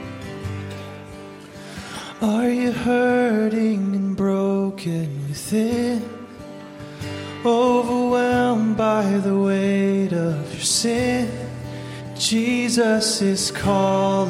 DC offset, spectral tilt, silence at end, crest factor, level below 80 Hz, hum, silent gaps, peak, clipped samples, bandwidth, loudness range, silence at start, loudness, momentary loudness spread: under 0.1%; -5 dB/octave; 0 s; 14 dB; -50 dBFS; none; none; -6 dBFS; under 0.1%; 16 kHz; 4 LU; 0 s; -20 LUFS; 17 LU